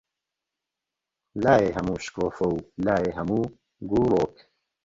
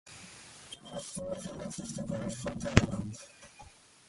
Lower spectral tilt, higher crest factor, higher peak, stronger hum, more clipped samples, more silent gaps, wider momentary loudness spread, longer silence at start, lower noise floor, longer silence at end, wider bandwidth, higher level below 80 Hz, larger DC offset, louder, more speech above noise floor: first, -7 dB/octave vs -5 dB/octave; second, 20 dB vs 32 dB; about the same, -6 dBFS vs -4 dBFS; neither; neither; neither; second, 10 LU vs 23 LU; first, 1.35 s vs 0.05 s; first, -87 dBFS vs -56 dBFS; first, 0.55 s vs 0.35 s; second, 7.8 kHz vs 11.5 kHz; about the same, -50 dBFS vs -48 dBFS; neither; first, -25 LUFS vs -35 LUFS; first, 62 dB vs 22 dB